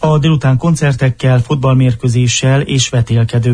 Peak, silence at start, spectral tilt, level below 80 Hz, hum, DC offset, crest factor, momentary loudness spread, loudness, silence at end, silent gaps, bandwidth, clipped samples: -2 dBFS; 0 s; -5.5 dB/octave; -36 dBFS; none; under 0.1%; 10 dB; 2 LU; -12 LUFS; 0 s; none; 10.5 kHz; under 0.1%